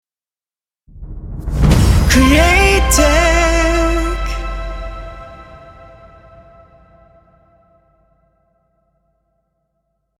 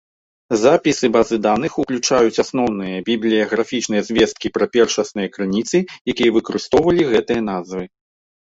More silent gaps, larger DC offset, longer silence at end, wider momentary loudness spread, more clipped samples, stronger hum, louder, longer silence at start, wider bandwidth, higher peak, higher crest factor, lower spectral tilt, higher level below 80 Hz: second, none vs 6.01-6.05 s; neither; first, 4.5 s vs 0.6 s; first, 23 LU vs 8 LU; neither; neither; first, -13 LUFS vs -18 LUFS; first, 0.95 s vs 0.5 s; first, 16.5 kHz vs 8 kHz; about the same, 0 dBFS vs -2 dBFS; about the same, 16 dB vs 16 dB; about the same, -4.5 dB/octave vs -4.5 dB/octave; first, -20 dBFS vs -50 dBFS